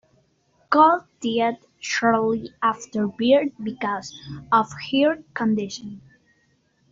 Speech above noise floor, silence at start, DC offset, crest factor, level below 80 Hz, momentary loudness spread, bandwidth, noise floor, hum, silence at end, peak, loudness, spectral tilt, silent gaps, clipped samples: 43 dB; 0.7 s; under 0.1%; 20 dB; -62 dBFS; 14 LU; 7.8 kHz; -65 dBFS; none; 0.95 s; -4 dBFS; -22 LUFS; -4.5 dB/octave; none; under 0.1%